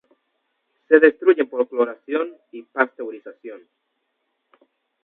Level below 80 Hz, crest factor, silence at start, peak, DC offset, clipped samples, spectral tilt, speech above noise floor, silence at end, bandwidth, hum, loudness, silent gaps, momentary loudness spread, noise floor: -74 dBFS; 22 dB; 0.9 s; 0 dBFS; under 0.1%; under 0.1%; -8.5 dB/octave; 54 dB; 1.45 s; 4 kHz; none; -19 LUFS; none; 24 LU; -74 dBFS